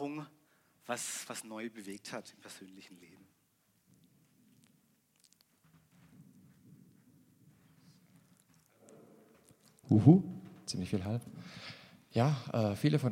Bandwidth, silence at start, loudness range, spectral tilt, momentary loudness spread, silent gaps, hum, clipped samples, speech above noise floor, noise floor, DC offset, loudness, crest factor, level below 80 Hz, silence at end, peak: 16 kHz; 0 s; 18 LU; -6.5 dB/octave; 26 LU; none; none; under 0.1%; 42 dB; -74 dBFS; under 0.1%; -33 LUFS; 28 dB; -76 dBFS; 0 s; -10 dBFS